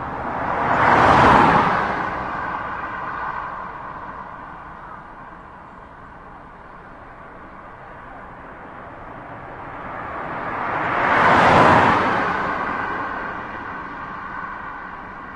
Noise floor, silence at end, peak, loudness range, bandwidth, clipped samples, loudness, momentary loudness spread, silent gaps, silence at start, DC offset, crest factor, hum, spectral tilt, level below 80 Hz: -40 dBFS; 0 s; 0 dBFS; 22 LU; 11 kHz; under 0.1%; -19 LUFS; 27 LU; none; 0 s; under 0.1%; 20 dB; none; -6 dB/octave; -44 dBFS